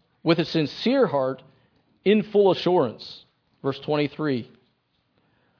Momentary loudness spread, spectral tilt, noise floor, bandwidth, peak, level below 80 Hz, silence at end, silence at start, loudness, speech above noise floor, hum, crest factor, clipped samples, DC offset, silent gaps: 13 LU; -7.5 dB/octave; -70 dBFS; 5.4 kHz; -6 dBFS; -68 dBFS; 1.15 s; 0.25 s; -23 LUFS; 47 dB; none; 18 dB; under 0.1%; under 0.1%; none